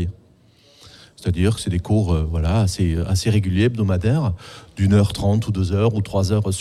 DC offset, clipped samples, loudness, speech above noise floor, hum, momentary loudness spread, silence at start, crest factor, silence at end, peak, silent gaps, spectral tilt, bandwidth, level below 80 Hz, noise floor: under 0.1%; under 0.1%; -20 LUFS; 34 dB; none; 7 LU; 0 s; 14 dB; 0 s; -4 dBFS; none; -6.5 dB/octave; 13 kHz; -34 dBFS; -53 dBFS